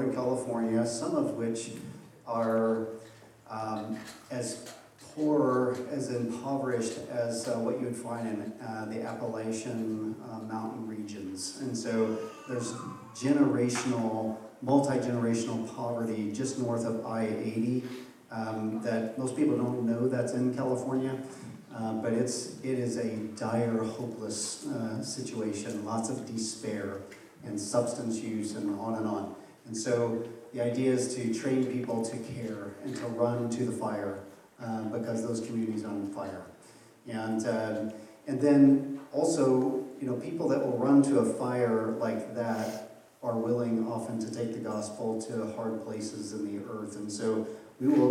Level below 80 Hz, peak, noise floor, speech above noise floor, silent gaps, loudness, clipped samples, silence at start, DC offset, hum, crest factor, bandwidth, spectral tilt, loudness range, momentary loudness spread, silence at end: -78 dBFS; -12 dBFS; -55 dBFS; 25 dB; none; -32 LUFS; under 0.1%; 0 s; under 0.1%; none; 20 dB; 14.5 kHz; -6 dB/octave; 7 LU; 12 LU; 0 s